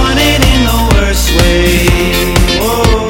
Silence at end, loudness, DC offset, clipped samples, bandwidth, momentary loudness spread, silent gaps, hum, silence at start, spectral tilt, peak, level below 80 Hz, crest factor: 0 s; -9 LUFS; under 0.1%; 0.2%; 17.5 kHz; 2 LU; none; none; 0 s; -4.5 dB/octave; 0 dBFS; -14 dBFS; 8 dB